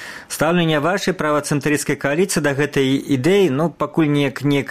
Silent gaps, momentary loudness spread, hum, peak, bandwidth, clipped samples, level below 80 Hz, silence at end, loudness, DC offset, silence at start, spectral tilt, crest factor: none; 4 LU; none; -2 dBFS; 15.5 kHz; under 0.1%; -50 dBFS; 0 s; -18 LUFS; 0.3%; 0 s; -5 dB/octave; 16 dB